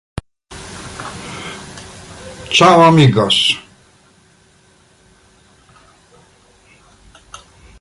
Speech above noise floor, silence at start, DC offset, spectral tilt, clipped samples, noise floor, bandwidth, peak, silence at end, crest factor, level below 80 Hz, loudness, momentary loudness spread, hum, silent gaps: 41 dB; 0.5 s; under 0.1%; -5 dB/octave; under 0.1%; -51 dBFS; 11.5 kHz; 0 dBFS; 4.2 s; 18 dB; -46 dBFS; -10 LUFS; 26 LU; none; none